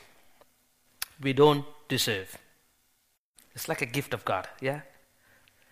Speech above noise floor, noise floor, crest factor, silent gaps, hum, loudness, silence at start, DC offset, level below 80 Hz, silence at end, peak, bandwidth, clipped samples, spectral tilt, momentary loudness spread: 44 dB; -72 dBFS; 24 dB; 3.19-3.34 s; none; -29 LUFS; 1 s; under 0.1%; -66 dBFS; 0.9 s; -8 dBFS; 15.5 kHz; under 0.1%; -4.5 dB/octave; 17 LU